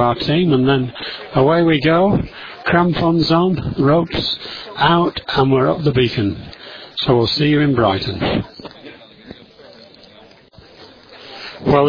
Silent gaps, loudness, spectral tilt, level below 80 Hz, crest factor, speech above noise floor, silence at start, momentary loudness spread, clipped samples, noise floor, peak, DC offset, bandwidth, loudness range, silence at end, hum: none; -16 LUFS; -8 dB/octave; -42 dBFS; 16 dB; 29 dB; 0 s; 15 LU; under 0.1%; -45 dBFS; 0 dBFS; under 0.1%; 5.4 kHz; 10 LU; 0 s; none